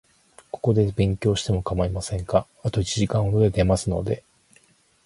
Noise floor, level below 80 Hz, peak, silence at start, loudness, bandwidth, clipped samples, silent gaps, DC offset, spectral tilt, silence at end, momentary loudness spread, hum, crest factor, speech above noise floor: -59 dBFS; -38 dBFS; -4 dBFS; 0.55 s; -23 LUFS; 11.5 kHz; under 0.1%; none; under 0.1%; -6.5 dB/octave; 0.85 s; 8 LU; none; 20 dB; 37 dB